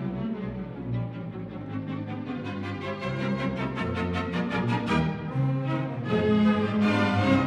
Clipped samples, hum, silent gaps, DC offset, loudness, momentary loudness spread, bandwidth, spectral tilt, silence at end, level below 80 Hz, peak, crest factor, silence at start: under 0.1%; none; none; under 0.1%; -28 LUFS; 12 LU; 9.4 kHz; -7.5 dB/octave; 0 s; -50 dBFS; -10 dBFS; 18 dB; 0 s